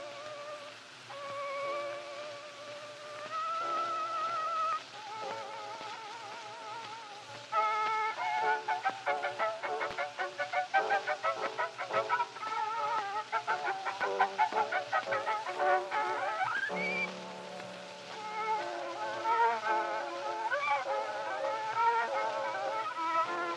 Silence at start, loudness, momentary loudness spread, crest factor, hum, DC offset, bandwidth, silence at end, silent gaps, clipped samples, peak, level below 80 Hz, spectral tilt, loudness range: 0 s; -34 LUFS; 13 LU; 20 dB; none; under 0.1%; 12 kHz; 0 s; none; under 0.1%; -14 dBFS; -86 dBFS; -2.5 dB/octave; 5 LU